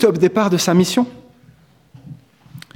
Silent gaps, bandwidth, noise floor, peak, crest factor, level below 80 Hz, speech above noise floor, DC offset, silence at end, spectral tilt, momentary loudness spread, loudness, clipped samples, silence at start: none; 17 kHz; -50 dBFS; -2 dBFS; 16 dB; -56 dBFS; 35 dB; under 0.1%; 0.15 s; -5.5 dB/octave; 6 LU; -16 LUFS; under 0.1%; 0 s